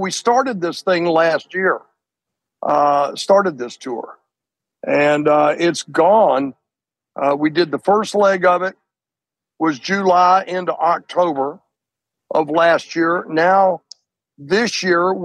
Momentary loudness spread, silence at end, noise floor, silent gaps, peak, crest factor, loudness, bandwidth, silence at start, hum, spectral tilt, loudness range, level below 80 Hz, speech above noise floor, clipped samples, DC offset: 12 LU; 0 s; -88 dBFS; none; -2 dBFS; 14 dB; -16 LUFS; 12 kHz; 0 s; none; -4.5 dB/octave; 2 LU; -68 dBFS; 72 dB; under 0.1%; under 0.1%